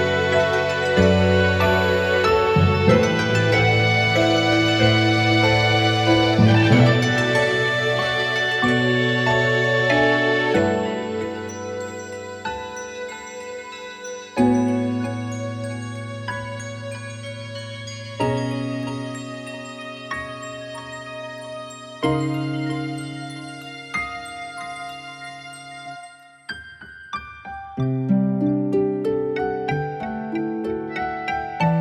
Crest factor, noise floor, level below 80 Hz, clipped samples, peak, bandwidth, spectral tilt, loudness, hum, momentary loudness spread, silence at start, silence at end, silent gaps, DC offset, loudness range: 20 dB; -44 dBFS; -48 dBFS; under 0.1%; -2 dBFS; 12.5 kHz; -6 dB/octave; -20 LUFS; none; 17 LU; 0 s; 0 s; none; under 0.1%; 14 LU